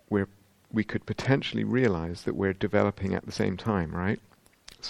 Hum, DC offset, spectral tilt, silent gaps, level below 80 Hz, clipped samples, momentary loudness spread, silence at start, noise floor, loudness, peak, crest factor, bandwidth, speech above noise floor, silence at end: none; under 0.1%; -7 dB/octave; none; -52 dBFS; under 0.1%; 7 LU; 0.1 s; -54 dBFS; -29 LUFS; -6 dBFS; 22 dB; 12 kHz; 26 dB; 0 s